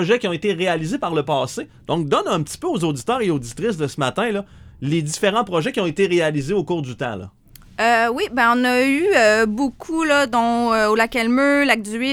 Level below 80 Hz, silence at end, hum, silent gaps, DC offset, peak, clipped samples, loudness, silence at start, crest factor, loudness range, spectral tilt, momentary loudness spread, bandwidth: -50 dBFS; 0 s; none; none; under 0.1%; 0 dBFS; under 0.1%; -19 LUFS; 0 s; 18 dB; 5 LU; -5 dB/octave; 9 LU; 17.5 kHz